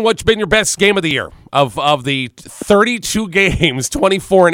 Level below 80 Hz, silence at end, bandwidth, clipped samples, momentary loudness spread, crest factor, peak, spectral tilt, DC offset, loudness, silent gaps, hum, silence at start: -36 dBFS; 0 s; 16.5 kHz; under 0.1%; 7 LU; 14 dB; 0 dBFS; -3.5 dB/octave; under 0.1%; -14 LUFS; none; none; 0 s